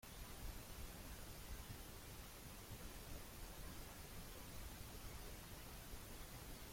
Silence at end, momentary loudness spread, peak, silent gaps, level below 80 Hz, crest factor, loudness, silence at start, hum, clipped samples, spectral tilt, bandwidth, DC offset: 0 s; 1 LU; -40 dBFS; none; -58 dBFS; 14 dB; -55 LUFS; 0 s; none; under 0.1%; -3.5 dB/octave; 16.5 kHz; under 0.1%